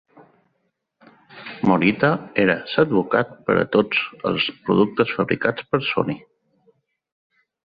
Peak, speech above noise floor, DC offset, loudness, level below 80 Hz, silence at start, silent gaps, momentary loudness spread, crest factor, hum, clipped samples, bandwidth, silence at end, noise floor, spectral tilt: -2 dBFS; 52 dB; under 0.1%; -20 LUFS; -56 dBFS; 1.35 s; none; 6 LU; 20 dB; none; under 0.1%; 5 kHz; 1.6 s; -72 dBFS; -9 dB/octave